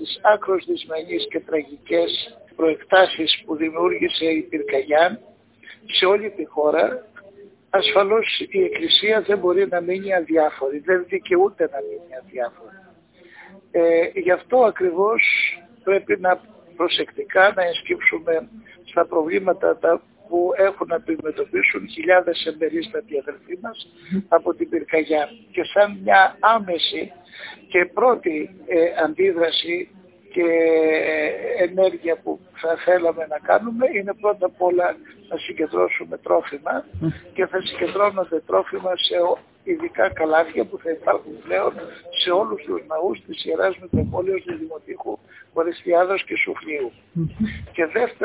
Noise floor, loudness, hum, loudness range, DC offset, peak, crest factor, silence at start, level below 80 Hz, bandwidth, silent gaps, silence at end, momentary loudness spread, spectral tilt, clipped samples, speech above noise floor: -50 dBFS; -20 LUFS; none; 5 LU; under 0.1%; 0 dBFS; 20 dB; 0 s; -54 dBFS; 4 kHz; none; 0 s; 12 LU; -8.5 dB/octave; under 0.1%; 30 dB